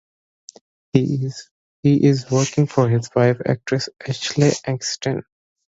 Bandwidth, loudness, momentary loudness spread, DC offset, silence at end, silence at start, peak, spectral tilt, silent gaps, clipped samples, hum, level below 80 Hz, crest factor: 8 kHz; -20 LUFS; 9 LU; under 0.1%; 0.45 s; 0.95 s; 0 dBFS; -6 dB/octave; 1.51-1.83 s; under 0.1%; none; -56 dBFS; 20 dB